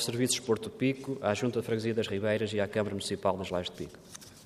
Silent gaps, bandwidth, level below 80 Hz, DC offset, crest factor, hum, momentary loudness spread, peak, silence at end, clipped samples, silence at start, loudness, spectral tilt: none; 15 kHz; -66 dBFS; under 0.1%; 20 dB; none; 10 LU; -12 dBFS; 0 s; under 0.1%; 0 s; -31 LUFS; -4.5 dB/octave